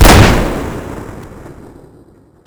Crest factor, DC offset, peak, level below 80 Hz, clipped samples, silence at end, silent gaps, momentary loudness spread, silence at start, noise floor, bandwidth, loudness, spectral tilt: 12 dB; under 0.1%; 0 dBFS; -18 dBFS; 3%; 0.95 s; none; 26 LU; 0 s; -44 dBFS; over 20 kHz; -11 LUFS; -5 dB/octave